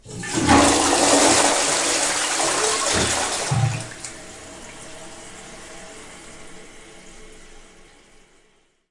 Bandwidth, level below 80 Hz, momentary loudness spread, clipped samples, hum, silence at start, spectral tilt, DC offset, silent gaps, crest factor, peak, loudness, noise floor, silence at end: 11.5 kHz; -46 dBFS; 24 LU; under 0.1%; none; 0.05 s; -2.5 dB/octave; under 0.1%; none; 18 dB; -4 dBFS; -18 LUFS; -60 dBFS; 1.4 s